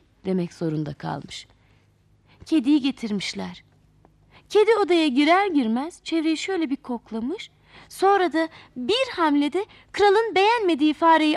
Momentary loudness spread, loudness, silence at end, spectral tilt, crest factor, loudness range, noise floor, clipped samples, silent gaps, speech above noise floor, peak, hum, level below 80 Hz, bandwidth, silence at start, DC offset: 14 LU; -22 LUFS; 0 s; -5 dB/octave; 16 dB; 6 LU; -60 dBFS; under 0.1%; none; 38 dB; -8 dBFS; none; -62 dBFS; 12.5 kHz; 0.25 s; under 0.1%